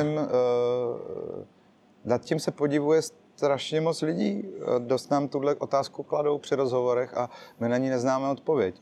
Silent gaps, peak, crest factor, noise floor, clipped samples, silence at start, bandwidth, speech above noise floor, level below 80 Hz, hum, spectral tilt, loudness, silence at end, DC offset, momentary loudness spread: none; -10 dBFS; 16 dB; -59 dBFS; under 0.1%; 0 s; 12.5 kHz; 33 dB; -74 dBFS; none; -6 dB/octave; -27 LUFS; 0.1 s; under 0.1%; 8 LU